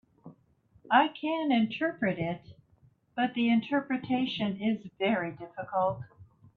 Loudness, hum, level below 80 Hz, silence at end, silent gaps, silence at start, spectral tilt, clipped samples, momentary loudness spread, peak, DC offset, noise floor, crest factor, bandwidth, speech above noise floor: -29 LUFS; none; -70 dBFS; 0.3 s; none; 0.25 s; -8 dB/octave; under 0.1%; 12 LU; -10 dBFS; under 0.1%; -65 dBFS; 22 dB; 4.7 kHz; 36 dB